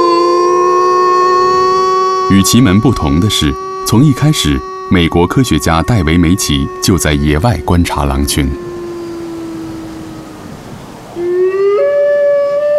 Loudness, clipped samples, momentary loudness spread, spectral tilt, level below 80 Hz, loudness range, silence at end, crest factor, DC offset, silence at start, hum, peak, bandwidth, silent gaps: -11 LUFS; under 0.1%; 15 LU; -5.5 dB/octave; -26 dBFS; 9 LU; 0 s; 12 dB; under 0.1%; 0 s; none; 0 dBFS; 15.5 kHz; none